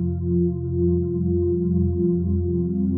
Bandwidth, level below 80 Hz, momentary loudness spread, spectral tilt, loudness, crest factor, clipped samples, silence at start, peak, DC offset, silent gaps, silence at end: 1.5 kHz; -36 dBFS; 2 LU; -17.5 dB/octave; -22 LUFS; 10 dB; under 0.1%; 0 s; -10 dBFS; under 0.1%; none; 0 s